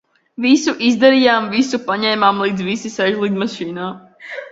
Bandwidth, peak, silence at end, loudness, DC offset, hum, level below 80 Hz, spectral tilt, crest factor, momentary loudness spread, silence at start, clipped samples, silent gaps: 7.8 kHz; 0 dBFS; 0.05 s; -16 LUFS; under 0.1%; none; -60 dBFS; -4.5 dB/octave; 16 dB; 16 LU; 0.4 s; under 0.1%; none